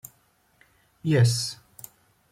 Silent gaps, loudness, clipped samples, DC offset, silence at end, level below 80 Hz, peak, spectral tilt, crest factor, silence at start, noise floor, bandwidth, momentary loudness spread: none; -24 LUFS; under 0.1%; under 0.1%; 0.75 s; -64 dBFS; -10 dBFS; -5 dB/octave; 18 dB; 1.05 s; -65 dBFS; 16 kHz; 25 LU